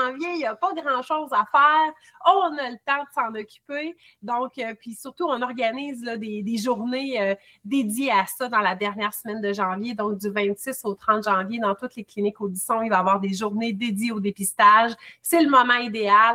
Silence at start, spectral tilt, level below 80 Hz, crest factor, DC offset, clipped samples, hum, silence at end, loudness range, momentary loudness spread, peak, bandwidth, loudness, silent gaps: 0 s; -4 dB/octave; -72 dBFS; 18 dB; under 0.1%; under 0.1%; none; 0 s; 8 LU; 14 LU; -4 dBFS; 16.5 kHz; -23 LUFS; none